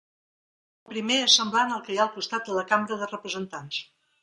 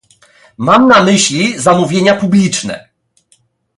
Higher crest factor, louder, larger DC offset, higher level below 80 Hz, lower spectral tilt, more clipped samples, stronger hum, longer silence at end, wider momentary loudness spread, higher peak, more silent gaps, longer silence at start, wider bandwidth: first, 22 dB vs 12 dB; second, -25 LUFS vs -10 LUFS; neither; second, -76 dBFS vs -52 dBFS; second, -1.5 dB/octave vs -4.5 dB/octave; neither; neither; second, 0.4 s vs 1 s; first, 15 LU vs 12 LU; second, -6 dBFS vs 0 dBFS; neither; first, 0.9 s vs 0.6 s; about the same, 11.5 kHz vs 11.5 kHz